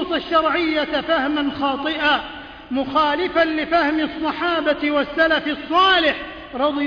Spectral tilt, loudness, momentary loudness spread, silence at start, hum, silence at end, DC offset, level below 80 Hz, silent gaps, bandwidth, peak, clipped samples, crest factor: -5 dB/octave; -19 LUFS; 6 LU; 0 s; none; 0 s; under 0.1%; -48 dBFS; none; 5.4 kHz; -6 dBFS; under 0.1%; 14 dB